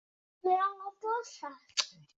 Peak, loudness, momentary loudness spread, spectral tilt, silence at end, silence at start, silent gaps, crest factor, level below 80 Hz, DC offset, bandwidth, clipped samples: -10 dBFS; -34 LUFS; 12 LU; 0.5 dB/octave; 0.25 s; 0.45 s; none; 24 dB; -86 dBFS; under 0.1%; 8 kHz; under 0.1%